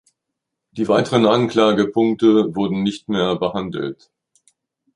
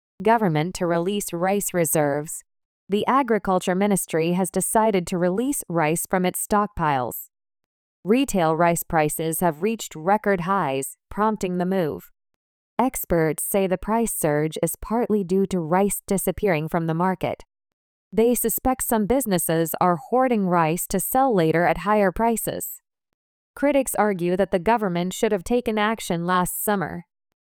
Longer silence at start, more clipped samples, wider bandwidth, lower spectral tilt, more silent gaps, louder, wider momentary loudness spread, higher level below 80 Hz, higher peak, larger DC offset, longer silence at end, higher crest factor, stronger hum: first, 0.75 s vs 0.2 s; neither; second, 11 kHz vs over 20 kHz; first, -6.5 dB/octave vs -5 dB/octave; second, none vs 2.65-2.87 s, 7.66-8.03 s, 12.36-12.77 s, 17.73-18.11 s, 23.14-23.54 s; first, -18 LUFS vs -22 LUFS; first, 11 LU vs 6 LU; second, -56 dBFS vs -48 dBFS; first, -2 dBFS vs -6 dBFS; neither; first, 1 s vs 0.5 s; about the same, 18 dB vs 16 dB; neither